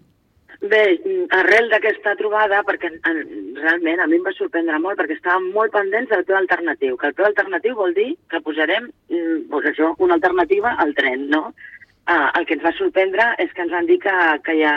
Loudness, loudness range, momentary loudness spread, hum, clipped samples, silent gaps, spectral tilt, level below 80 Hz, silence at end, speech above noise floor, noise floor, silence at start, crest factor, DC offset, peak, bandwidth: -18 LUFS; 2 LU; 6 LU; none; under 0.1%; none; -4.5 dB/octave; -60 dBFS; 0 s; 38 dB; -56 dBFS; 0.5 s; 16 dB; under 0.1%; -2 dBFS; 7 kHz